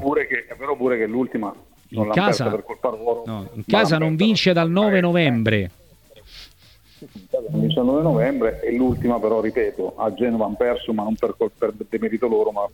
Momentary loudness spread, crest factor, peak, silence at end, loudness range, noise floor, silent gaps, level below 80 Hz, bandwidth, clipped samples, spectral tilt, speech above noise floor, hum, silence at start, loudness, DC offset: 10 LU; 18 dB; -4 dBFS; 0.05 s; 4 LU; -52 dBFS; none; -48 dBFS; 17.5 kHz; under 0.1%; -6.5 dB/octave; 31 dB; none; 0 s; -21 LUFS; under 0.1%